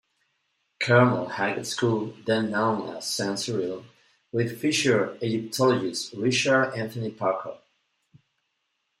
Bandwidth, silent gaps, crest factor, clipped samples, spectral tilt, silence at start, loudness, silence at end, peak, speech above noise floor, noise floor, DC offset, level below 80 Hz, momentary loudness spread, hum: 15.5 kHz; none; 20 dB; under 0.1%; -4.5 dB/octave; 0.8 s; -25 LUFS; 1.45 s; -6 dBFS; 52 dB; -77 dBFS; under 0.1%; -70 dBFS; 10 LU; none